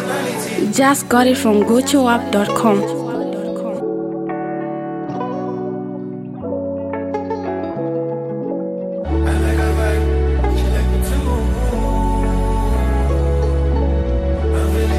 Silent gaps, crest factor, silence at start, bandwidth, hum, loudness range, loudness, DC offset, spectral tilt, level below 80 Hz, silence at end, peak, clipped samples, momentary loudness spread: none; 16 dB; 0 s; 15.5 kHz; none; 8 LU; -19 LUFS; under 0.1%; -6 dB/octave; -22 dBFS; 0 s; 0 dBFS; under 0.1%; 10 LU